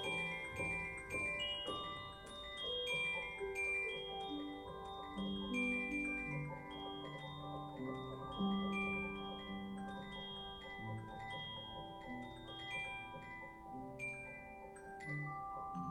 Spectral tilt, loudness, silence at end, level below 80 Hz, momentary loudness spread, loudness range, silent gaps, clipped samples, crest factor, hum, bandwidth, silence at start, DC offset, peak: -4.5 dB/octave; -43 LUFS; 0 s; -64 dBFS; 11 LU; 7 LU; none; under 0.1%; 16 dB; none; 15.5 kHz; 0 s; under 0.1%; -28 dBFS